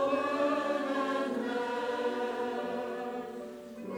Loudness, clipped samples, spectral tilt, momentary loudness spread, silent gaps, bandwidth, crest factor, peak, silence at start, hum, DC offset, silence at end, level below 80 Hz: -33 LUFS; under 0.1%; -4.5 dB/octave; 11 LU; none; over 20 kHz; 16 dB; -18 dBFS; 0 s; none; under 0.1%; 0 s; -74 dBFS